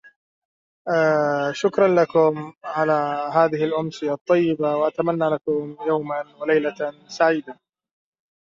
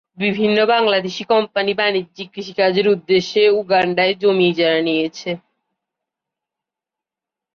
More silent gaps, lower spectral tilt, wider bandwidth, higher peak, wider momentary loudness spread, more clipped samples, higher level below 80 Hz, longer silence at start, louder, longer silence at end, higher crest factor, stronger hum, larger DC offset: first, 4.21-4.25 s vs none; about the same, -6.5 dB/octave vs -5.5 dB/octave; first, 7.6 kHz vs 6.8 kHz; about the same, -4 dBFS vs -4 dBFS; about the same, 9 LU vs 11 LU; neither; about the same, -68 dBFS vs -64 dBFS; first, 0.85 s vs 0.2 s; second, -21 LUFS vs -17 LUFS; second, 0.9 s vs 2.15 s; about the same, 18 dB vs 14 dB; neither; neither